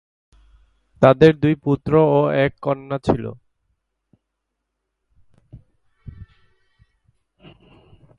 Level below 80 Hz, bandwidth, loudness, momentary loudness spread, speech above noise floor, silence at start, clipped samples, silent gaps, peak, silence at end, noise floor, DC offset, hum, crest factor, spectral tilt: -48 dBFS; 9.8 kHz; -17 LUFS; 11 LU; 62 dB; 1 s; under 0.1%; none; 0 dBFS; 2.1 s; -78 dBFS; under 0.1%; none; 22 dB; -8.5 dB/octave